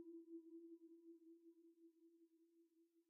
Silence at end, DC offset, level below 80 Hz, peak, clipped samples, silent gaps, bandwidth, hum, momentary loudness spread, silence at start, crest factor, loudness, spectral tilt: 0 s; under 0.1%; under -90 dBFS; -50 dBFS; under 0.1%; none; 1.1 kHz; none; 8 LU; 0 s; 14 dB; -63 LUFS; -0.5 dB/octave